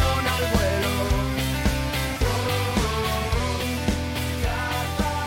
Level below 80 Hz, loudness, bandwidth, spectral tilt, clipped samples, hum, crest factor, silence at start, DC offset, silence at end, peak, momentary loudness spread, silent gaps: -30 dBFS; -24 LUFS; 17 kHz; -4.5 dB/octave; under 0.1%; none; 14 dB; 0 s; under 0.1%; 0 s; -10 dBFS; 4 LU; none